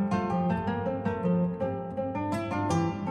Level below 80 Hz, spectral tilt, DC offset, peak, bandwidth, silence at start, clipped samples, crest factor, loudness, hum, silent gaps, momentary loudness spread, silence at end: -58 dBFS; -7.5 dB/octave; under 0.1%; -16 dBFS; 10.5 kHz; 0 s; under 0.1%; 14 dB; -30 LUFS; none; none; 5 LU; 0 s